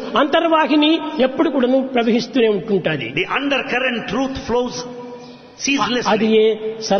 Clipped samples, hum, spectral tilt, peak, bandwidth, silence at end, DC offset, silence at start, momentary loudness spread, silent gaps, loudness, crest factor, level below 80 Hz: under 0.1%; none; -4.5 dB/octave; -2 dBFS; 6.6 kHz; 0 s; under 0.1%; 0 s; 9 LU; none; -17 LUFS; 14 dB; -50 dBFS